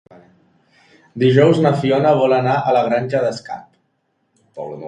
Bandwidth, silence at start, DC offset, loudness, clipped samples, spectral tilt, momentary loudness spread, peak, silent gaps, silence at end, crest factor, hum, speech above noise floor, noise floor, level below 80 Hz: 10.5 kHz; 1.15 s; under 0.1%; -15 LUFS; under 0.1%; -7.5 dB/octave; 20 LU; 0 dBFS; none; 0 s; 18 dB; none; 52 dB; -67 dBFS; -60 dBFS